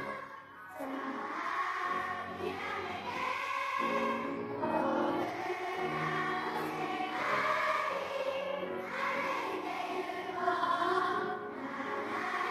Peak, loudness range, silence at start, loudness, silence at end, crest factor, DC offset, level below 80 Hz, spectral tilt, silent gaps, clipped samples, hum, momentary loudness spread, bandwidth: -16 dBFS; 2 LU; 0 s; -35 LUFS; 0 s; 18 dB; under 0.1%; -74 dBFS; -4.5 dB/octave; none; under 0.1%; none; 8 LU; 15 kHz